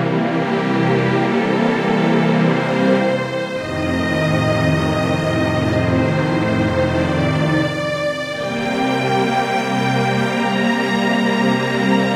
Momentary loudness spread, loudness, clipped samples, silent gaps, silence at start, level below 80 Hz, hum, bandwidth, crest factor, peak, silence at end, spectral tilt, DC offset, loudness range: 4 LU; -17 LUFS; under 0.1%; none; 0 s; -44 dBFS; none; 14.5 kHz; 14 dB; -4 dBFS; 0 s; -6.5 dB/octave; under 0.1%; 2 LU